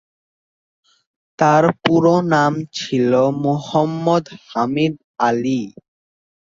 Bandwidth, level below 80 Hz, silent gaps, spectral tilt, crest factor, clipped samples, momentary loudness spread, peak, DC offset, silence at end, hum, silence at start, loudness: 7.6 kHz; -60 dBFS; 5.04-5.14 s; -6.5 dB/octave; 18 dB; under 0.1%; 8 LU; -2 dBFS; under 0.1%; 0.9 s; none; 1.4 s; -17 LUFS